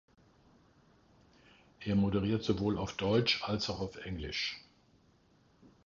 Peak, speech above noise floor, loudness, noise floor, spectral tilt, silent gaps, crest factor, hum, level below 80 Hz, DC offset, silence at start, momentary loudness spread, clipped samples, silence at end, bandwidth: -16 dBFS; 34 dB; -33 LUFS; -67 dBFS; -5.5 dB/octave; none; 20 dB; none; -56 dBFS; under 0.1%; 1.8 s; 11 LU; under 0.1%; 0.15 s; 7.4 kHz